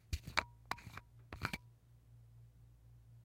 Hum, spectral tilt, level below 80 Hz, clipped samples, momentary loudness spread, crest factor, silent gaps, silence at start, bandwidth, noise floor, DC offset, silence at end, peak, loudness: none; -3.5 dB/octave; -58 dBFS; under 0.1%; 25 LU; 36 dB; none; 0.05 s; 16.5 kHz; -64 dBFS; under 0.1%; 0 s; -12 dBFS; -44 LUFS